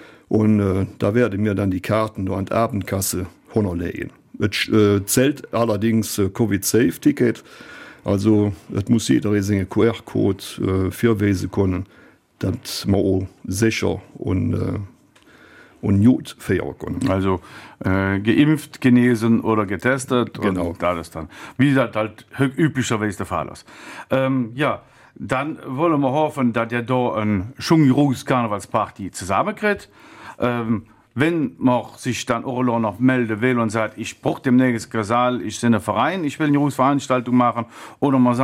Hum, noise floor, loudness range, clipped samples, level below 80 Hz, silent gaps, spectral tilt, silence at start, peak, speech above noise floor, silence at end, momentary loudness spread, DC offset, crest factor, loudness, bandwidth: none; -51 dBFS; 4 LU; under 0.1%; -52 dBFS; none; -6 dB/octave; 0 s; -4 dBFS; 31 dB; 0 s; 10 LU; under 0.1%; 16 dB; -20 LUFS; 16.5 kHz